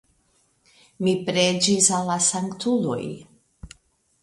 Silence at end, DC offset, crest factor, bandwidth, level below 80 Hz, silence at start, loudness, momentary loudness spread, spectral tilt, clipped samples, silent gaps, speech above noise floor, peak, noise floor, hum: 0.55 s; under 0.1%; 22 dB; 12 kHz; -56 dBFS; 1 s; -21 LUFS; 12 LU; -3 dB/octave; under 0.1%; none; 43 dB; -2 dBFS; -65 dBFS; none